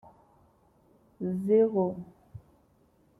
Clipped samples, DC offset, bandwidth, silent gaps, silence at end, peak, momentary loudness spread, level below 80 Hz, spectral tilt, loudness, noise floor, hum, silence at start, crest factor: under 0.1%; under 0.1%; 3.1 kHz; none; 0.8 s; -14 dBFS; 19 LU; -68 dBFS; -11 dB/octave; -28 LUFS; -65 dBFS; none; 1.2 s; 18 dB